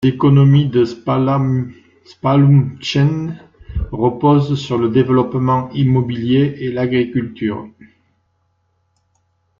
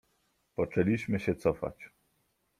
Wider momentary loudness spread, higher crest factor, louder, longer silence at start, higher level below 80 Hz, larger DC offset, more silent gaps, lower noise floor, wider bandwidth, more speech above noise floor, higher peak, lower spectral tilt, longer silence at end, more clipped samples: about the same, 12 LU vs 12 LU; second, 14 dB vs 22 dB; first, -15 LUFS vs -31 LUFS; second, 0 s vs 0.6 s; first, -40 dBFS vs -58 dBFS; neither; neither; second, -64 dBFS vs -75 dBFS; second, 7.2 kHz vs 14.5 kHz; first, 49 dB vs 45 dB; first, -2 dBFS vs -12 dBFS; about the same, -8.5 dB/octave vs -8 dB/octave; first, 1.9 s vs 0.75 s; neither